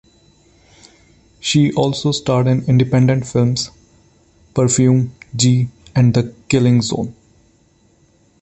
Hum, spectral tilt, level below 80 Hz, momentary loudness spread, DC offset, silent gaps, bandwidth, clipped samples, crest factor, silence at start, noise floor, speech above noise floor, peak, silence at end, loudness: none; -5.5 dB/octave; -48 dBFS; 10 LU; under 0.1%; none; 8.6 kHz; under 0.1%; 16 dB; 1.45 s; -55 dBFS; 40 dB; -2 dBFS; 1.3 s; -16 LUFS